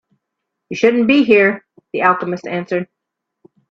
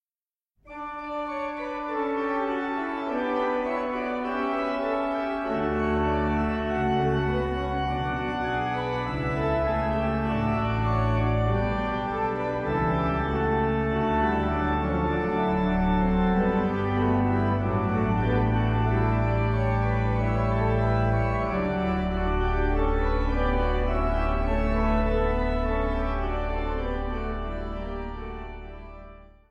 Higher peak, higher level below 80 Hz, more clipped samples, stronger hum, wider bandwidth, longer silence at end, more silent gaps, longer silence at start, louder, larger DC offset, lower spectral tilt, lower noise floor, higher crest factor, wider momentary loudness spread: first, 0 dBFS vs -12 dBFS; second, -62 dBFS vs -32 dBFS; neither; neither; about the same, 7.4 kHz vs 7 kHz; first, 0.85 s vs 0.25 s; neither; about the same, 0.7 s vs 0.65 s; first, -15 LUFS vs -26 LUFS; neither; second, -6 dB/octave vs -9 dB/octave; second, -77 dBFS vs under -90 dBFS; about the same, 16 dB vs 14 dB; first, 17 LU vs 7 LU